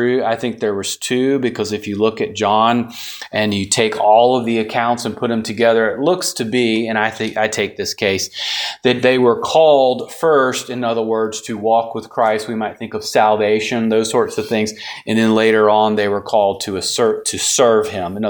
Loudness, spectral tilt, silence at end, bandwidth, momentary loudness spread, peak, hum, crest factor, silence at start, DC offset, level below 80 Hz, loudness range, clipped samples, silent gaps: -16 LUFS; -3.5 dB/octave; 0 s; 19.5 kHz; 8 LU; 0 dBFS; none; 16 dB; 0 s; under 0.1%; -58 dBFS; 3 LU; under 0.1%; none